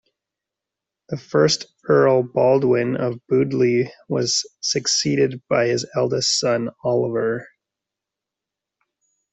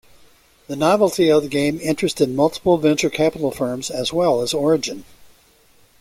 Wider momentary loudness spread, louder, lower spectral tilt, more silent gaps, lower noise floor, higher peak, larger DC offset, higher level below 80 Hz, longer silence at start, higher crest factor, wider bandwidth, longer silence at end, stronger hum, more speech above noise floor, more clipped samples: about the same, 7 LU vs 7 LU; about the same, -20 LUFS vs -19 LUFS; about the same, -4 dB/octave vs -5 dB/octave; neither; first, -86 dBFS vs -54 dBFS; about the same, -4 dBFS vs -2 dBFS; neither; second, -62 dBFS vs -54 dBFS; first, 1.1 s vs 0.7 s; about the same, 18 dB vs 18 dB; second, 8.4 kHz vs 16.5 kHz; first, 1.85 s vs 0.95 s; neither; first, 66 dB vs 36 dB; neither